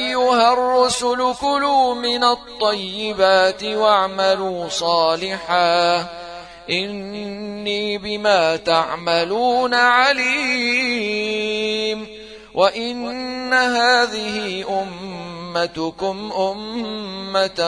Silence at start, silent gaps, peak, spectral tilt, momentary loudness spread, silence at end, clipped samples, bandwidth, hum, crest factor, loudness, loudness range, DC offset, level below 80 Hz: 0 s; none; -2 dBFS; -3 dB/octave; 12 LU; 0 s; under 0.1%; 10.5 kHz; none; 18 dB; -18 LUFS; 4 LU; under 0.1%; -54 dBFS